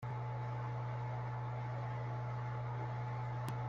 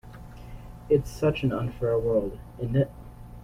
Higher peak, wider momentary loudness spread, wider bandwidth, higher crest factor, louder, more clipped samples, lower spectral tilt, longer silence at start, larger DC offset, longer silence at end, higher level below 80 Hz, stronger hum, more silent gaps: second, -26 dBFS vs -10 dBFS; second, 1 LU vs 20 LU; second, 7 kHz vs 16 kHz; about the same, 14 dB vs 18 dB; second, -42 LUFS vs -27 LUFS; neither; about the same, -8 dB/octave vs -8 dB/octave; about the same, 0 s vs 0.05 s; neither; about the same, 0 s vs 0 s; second, -64 dBFS vs -44 dBFS; neither; neither